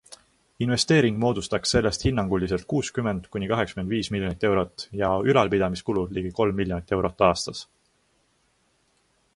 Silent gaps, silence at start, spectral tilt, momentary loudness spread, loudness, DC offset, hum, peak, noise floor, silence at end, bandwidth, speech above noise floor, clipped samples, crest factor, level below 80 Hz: none; 0.1 s; -5 dB/octave; 8 LU; -24 LUFS; under 0.1%; none; -4 dBFS; -67 dBFS; 1.75 s; 11.5 kHz; 43 dB; under 0.1%; 20 dB; -44 dBFS